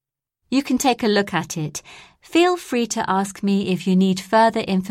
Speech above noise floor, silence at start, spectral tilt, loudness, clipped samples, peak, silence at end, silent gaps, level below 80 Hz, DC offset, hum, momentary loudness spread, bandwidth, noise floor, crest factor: 54 dB; 0.5 s; -5 dB/octave; -20 LUFS; under 0.1%; -4 dBFS; 0 s; none; -58 dBFS; under 0.1%; none; 7 LU; 15.5 kHz; -74 dBFS; 16 dB